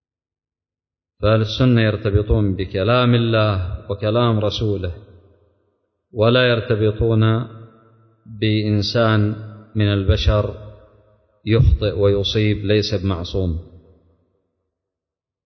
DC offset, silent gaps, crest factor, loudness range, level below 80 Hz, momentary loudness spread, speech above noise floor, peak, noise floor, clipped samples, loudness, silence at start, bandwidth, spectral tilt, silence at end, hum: under 0.1%; none; 16 dB; 3 LU; -30 dBFS; 11 LU; 73 dB; -4 dBFS; -90 dBFS; under 0.1%; -18 LUFS; 1.2 s; 6.4 kHz; -7.5 dB/octave; 1.7 s; none